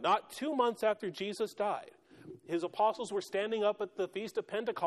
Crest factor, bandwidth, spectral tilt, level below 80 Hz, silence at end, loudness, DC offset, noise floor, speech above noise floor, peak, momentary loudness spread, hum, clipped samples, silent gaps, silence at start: 18 dB; 13.5 kHz; -4.5 dB/octave; -80 dBFS; 0 s; -35 LUFS; under 0.1%; -53 dBFS; 20 dB; -18 dBFS; 7 LU; none; under 0.1%; none; 0 s